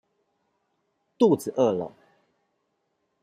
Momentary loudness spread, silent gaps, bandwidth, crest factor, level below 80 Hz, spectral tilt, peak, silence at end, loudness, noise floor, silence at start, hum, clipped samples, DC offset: 11 LU; none; 15 kHz; 20 dB; -74 dBFS; -7 dB/octave; -8 dBFS; 1.35 s; -24 LUFS; -75 dBFS; 1.2 s; none; under 0.1%; under 0.1%